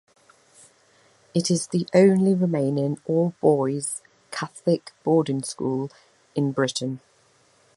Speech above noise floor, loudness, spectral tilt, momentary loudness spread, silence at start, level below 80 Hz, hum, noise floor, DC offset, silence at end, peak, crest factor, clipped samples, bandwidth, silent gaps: 38 dB; -23 LUFS; -6 dB/octave; 15 LU; 1.35 s; -70 dBFS; none; -60 dBFS; under 0.1%; 0.8 s; -4 dBFS; 20 dB; under 0.1%; 11.5 kHz; none